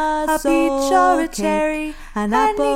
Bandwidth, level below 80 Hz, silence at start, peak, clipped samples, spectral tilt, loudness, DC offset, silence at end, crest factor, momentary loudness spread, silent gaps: 16.5 kHz; -38 dBFS; 0 s; -4 dBFS; under 0.1%; -4 dB/octave; -18 LUFS; under 0.1%; 0 s; 14 dB; 9 LU; none